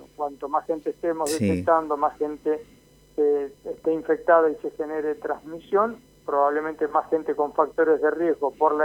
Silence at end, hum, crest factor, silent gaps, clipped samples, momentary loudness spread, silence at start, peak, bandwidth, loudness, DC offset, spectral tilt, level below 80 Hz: 0 s; none; 18 dB; none; under 0.1%; 10 LU; 0 s; -6 dBFS; 16.5 kHz; -24 LUFS; under 0.1%; -6 dB/octave; -60 dBFS